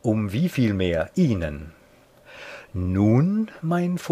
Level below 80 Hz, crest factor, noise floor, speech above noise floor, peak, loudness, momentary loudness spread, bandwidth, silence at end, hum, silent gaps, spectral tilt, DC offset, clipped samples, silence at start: -46 dBFS; 16 dB; -53 dBFS; 31 dB; -8 dBFS; -23 LUFS; 19 LU; 15.5 kHz; 0 s; none; none; -8 dB/octave; under 0.1%; under 0.1%; 0.05 s